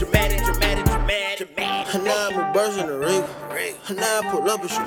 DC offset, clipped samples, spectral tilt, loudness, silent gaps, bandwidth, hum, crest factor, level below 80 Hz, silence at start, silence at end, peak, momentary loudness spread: under 0.1%; under 0.1%; -4 dB/octave; -22 LUFS; none; over 20 kHz; none; 20 dB; -30 dBFS; 0 s; 0 s; -2 dBFS; 7 LU